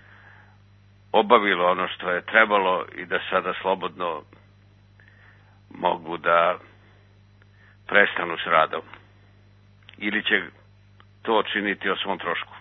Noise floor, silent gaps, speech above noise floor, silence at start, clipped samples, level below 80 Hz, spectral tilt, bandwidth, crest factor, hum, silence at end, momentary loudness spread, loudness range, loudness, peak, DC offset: -54 dBFS; none; 31 dB; 1.15 s; under 0.1%; -64 dBFS; -7 dB/octave; 5.6 kHz; 26 dB; 50 Hz at -55 dBFS; 0 s; 12 LU; 6 LU; -23 LUFS; 0 dBFS; under 0.1%